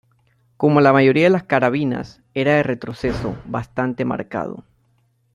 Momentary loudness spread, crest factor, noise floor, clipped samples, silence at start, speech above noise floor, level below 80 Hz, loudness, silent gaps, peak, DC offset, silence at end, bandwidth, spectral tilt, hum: 14 LU; 18 dB; -62 dBFS; under 0.1%; 0.6 s; 44 dB; -46 dBFS; -19 LUFS; none; -2 dBFS; under 0.1%; 0.75 s; 10.5 kHz; -8 dB/octave; none